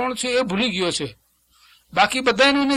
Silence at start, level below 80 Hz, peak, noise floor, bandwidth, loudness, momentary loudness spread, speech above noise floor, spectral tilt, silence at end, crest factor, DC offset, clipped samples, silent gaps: 0 s; -54 dBFS; -2 dBFS; -57 dBFS; 14.5 kHz; -20 LUFS; 10 LU; 37 dB; -3 dB/octave; 0 s; 20 dB; under 0.1%; under 0.1%; none